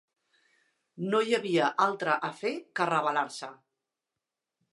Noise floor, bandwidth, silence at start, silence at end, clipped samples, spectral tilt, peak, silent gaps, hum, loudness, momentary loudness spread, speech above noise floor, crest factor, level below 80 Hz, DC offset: -88 dBFS; 11.5 kHz; 0.95 s; 1.2 s; under 0.1%; -4.5 dB/octave; -12 dBFS; none; none; -29 LUFS; 11 LU; 60 dB; 20 dB; -86 dBFS; under 0.1%